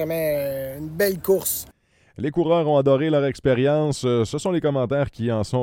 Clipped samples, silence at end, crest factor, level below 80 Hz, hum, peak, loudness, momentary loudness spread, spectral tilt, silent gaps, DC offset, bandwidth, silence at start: under 0.1%; 0 s; 16 dB; -50 dBFS; none; -6 dBFS; -22 LUFS; 9 LU; -6 dB/octave; none; under 0.1%; 17 kHz; 0 s